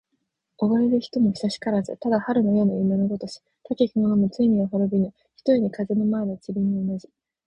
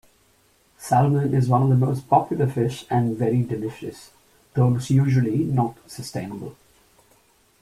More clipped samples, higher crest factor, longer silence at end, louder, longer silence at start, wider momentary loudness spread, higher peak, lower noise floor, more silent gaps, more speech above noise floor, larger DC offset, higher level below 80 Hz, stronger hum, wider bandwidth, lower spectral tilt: neither; about the same, 16 dB vs 20 dB; second, 0.45 s vs 1.1 s; about the same, -23 LUFS vs -22 LUFS; second, 0.6 s vs 0.8 s; second, 9 LU vs 16 LU; second, -8 dBFS vs -4 dBFS; first, -76 dBFS vs -60 dBFS; neither; first, 54 dB vs 39 dB; neither; about the same, -58 dBFS vs -54 dBFS; neither; second, 8.8 kHz vs 13 kHz; about the same, -8 dB/octave vs -8 dB/octave